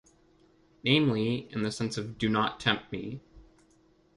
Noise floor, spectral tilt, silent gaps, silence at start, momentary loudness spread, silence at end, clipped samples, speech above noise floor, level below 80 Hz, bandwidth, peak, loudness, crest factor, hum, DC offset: -64 dBFS; -5.5 dB/octave; none; 0.85 s; 14 LU; 0.75 s; under 0.1%; 35 dB; -60 dBFS; 11.5 kHz; -10 dBFS; -29 LUFS; 22 dB; none; under 0.1%